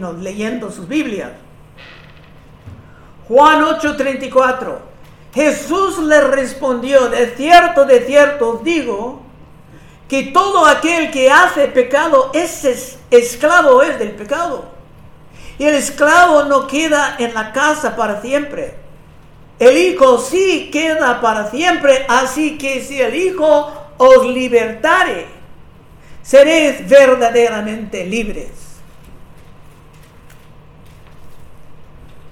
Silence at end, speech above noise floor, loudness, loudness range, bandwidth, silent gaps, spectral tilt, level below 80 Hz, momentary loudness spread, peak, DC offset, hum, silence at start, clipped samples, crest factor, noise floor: 0 s; 28 dB; -12 LUFS; 5 LU; 16 kHz; none; -3 dB/octave; -42 dBFS; 14 LU; 0 dBFS; under 0.1%; none; 0 s; 0.7%; 14 dB; -40 dBFS